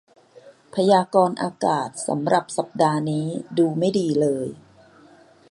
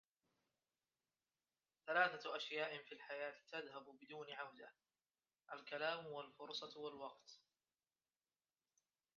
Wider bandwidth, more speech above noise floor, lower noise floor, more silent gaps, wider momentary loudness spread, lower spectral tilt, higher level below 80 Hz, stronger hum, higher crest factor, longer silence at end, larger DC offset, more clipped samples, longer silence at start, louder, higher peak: first, 11.5 kHz vs 7.2 kHz; second, 30 dB vs over 42 dB; second, -51 dBFS vs under -90 dBFS; neither; second, 8 LU vs 18 LU; first, -6 dB/octave vs 0 dB/octave; first, -68 dBFS vs under -90 dBFS; neither; second, 20 dB vs 26 dB; second, 0.95 s vs 1.8 s; neither; neither; second, 0.45 s vs 1.85 s; first, -22 LUFS vs -47 LUFS; first, -2 dBFS vs -24 dBFS